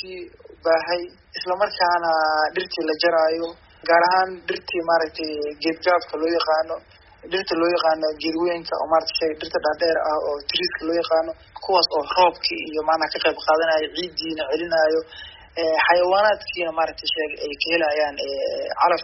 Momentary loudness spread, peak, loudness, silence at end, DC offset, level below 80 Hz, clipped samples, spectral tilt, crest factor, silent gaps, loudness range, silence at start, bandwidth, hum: 9 LU; -2 dBFS; -21 LUFS; 0 s; under 0.1%; -56 dBFS; under 0.1%; 0 dB/octave; 20 dB; none; 2 LU; 0 s; 6 kHz; none